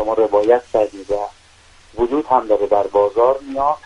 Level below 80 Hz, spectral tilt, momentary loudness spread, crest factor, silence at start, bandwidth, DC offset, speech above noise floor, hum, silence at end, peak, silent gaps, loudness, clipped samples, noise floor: -46 dBFS; -6 dB/octave; 9 LU; 16 dB; 0 s; 10.5 kHz; under 0.1%; 31 dB; none; 0.05 s; 0 dBFS; none; -17 LUFS; under 0.1%; -48 dBFS